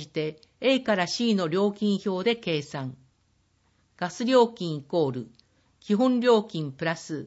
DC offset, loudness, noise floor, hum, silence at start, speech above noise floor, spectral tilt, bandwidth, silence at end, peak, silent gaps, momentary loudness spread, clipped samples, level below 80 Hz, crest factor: under 0.1%; -26 LUFS; -68 dBFS; none; 0 s; 42 dB; -5.5 dB/octave; 8 kHz; 0 s; -8 dBFS; none; 13 LU; under 0.1%; -72 dBFS; 18 dB